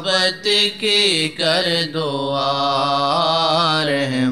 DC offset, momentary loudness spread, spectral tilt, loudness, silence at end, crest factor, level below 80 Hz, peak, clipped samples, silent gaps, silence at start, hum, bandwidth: 0.3%; 5 LU; -3.5 dB/octave; -17 LUFS; 0 s; 14 dB; -62 dBFS; -4 dBFS; under 0.1%; none; 0 s; none; 15 kHz